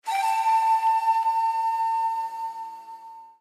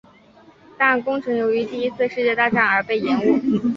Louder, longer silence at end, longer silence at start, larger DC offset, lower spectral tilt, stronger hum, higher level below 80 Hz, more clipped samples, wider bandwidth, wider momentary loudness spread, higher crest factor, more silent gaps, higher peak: second, -24 LUFS vs -19 LUFS; about the same, 0.1 s vs 0 s; second, 0.05 s vs 0.8 s; neither; second, 2.5 dB/octave vs -7 dB/octave; neither; second, under -90 dBFS vs -60 dBFS; neither; first, 15 kHz vs 7.2 kHz; first, 18 LU vs 5 LU; second, 12 dB vs 18 dB; neither; second, -14 dBFS vs -2 dBFS